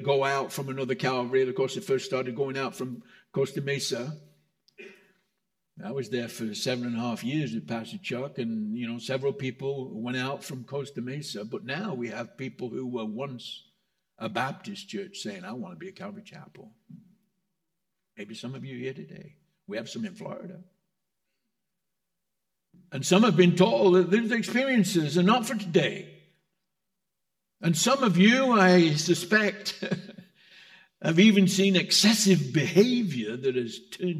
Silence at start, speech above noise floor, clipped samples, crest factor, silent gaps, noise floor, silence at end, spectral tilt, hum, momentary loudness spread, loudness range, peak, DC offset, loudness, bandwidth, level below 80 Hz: 0 s; 58 dB; under 0.1%; 22 dB; none; -85 dBFS; 0 s; -5 dB/octave; none; 19 LU; 18 LU; -6 dBFS; under 0.1%; -26 LUFS; 16 kHz; -80 dBFS